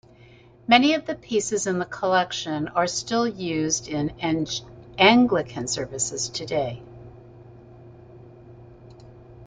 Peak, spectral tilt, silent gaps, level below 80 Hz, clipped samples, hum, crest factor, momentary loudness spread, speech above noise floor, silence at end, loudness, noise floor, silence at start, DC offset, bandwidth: -4 dBFS; -3.5 dB/octave; none; -56 dBFS; under 0.1%; none; 22 dB; 12 LU; 28 dB; 0 s; -23 LUFS; -51 dBFS; 0.7 s; under 0.1%; 9.6 kHz